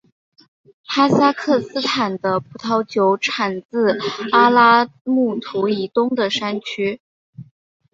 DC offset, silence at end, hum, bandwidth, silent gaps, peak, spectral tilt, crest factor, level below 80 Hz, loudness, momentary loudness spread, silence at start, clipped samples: under 0.1%; 0.5 s; none; 7.8 kHz; 3.65-3.69 s, 5.01-5.05 s, 7.00-7.33 s; -2 dBFS; -5 dB/octave; 18 dB; -64 dBFS; -18 LUFS; 10 LU; 0.9 s; under 0.1%